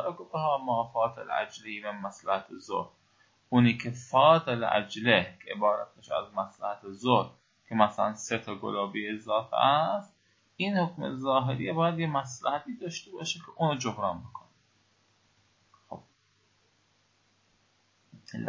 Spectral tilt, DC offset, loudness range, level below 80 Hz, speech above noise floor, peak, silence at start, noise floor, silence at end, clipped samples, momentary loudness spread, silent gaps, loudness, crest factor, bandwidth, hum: -5.5 dB/octave; under 0.1%; 9 LU; -68 dBFS; 40 dB; -6 dBFS; 0 s; -69 dBFS; 0 s; under 0.1%; 13 LU; none; -29 LUFS; 24 dB; 7.8 kHz; none